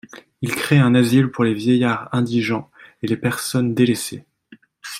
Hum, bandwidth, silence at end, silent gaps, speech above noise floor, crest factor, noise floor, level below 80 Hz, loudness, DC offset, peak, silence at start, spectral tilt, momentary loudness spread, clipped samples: none; 16 kHz; 0 s; none; 32 dB; 16 dB; -50 dBFS; -58 dBFS; -19 LUFS; under 0.1%; -2 dBFS; 0.15 s; -6 dB/octave; 14 LU; under 0.1%